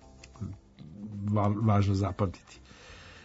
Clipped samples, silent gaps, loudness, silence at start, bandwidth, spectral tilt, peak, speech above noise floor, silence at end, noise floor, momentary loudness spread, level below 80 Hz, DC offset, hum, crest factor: under 0.1%; none; -29 LUFS; 0.25 s; 8 kHz; -8 dB/octave; -12 dBFS; 23 dB; 0.05 s; -50 dBFS; 24 LU; -56 dBFS; under 0.1%; none; 18 dB